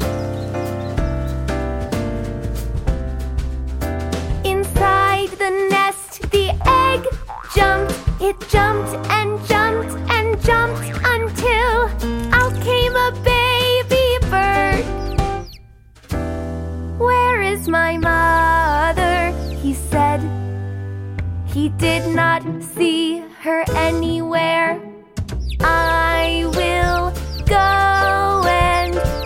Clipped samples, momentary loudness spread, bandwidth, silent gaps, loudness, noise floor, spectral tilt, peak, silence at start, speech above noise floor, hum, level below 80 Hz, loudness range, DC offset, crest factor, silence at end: under 0.1%; 11 LU; 16.5 kHz; none; -18 LUFS; -44 dBFS; -5 dB/octave; 0 dBFS; 0 s; 26 dB; none; -26 dBFS; 4 LU; under 0.1%; 18 dB; 0 s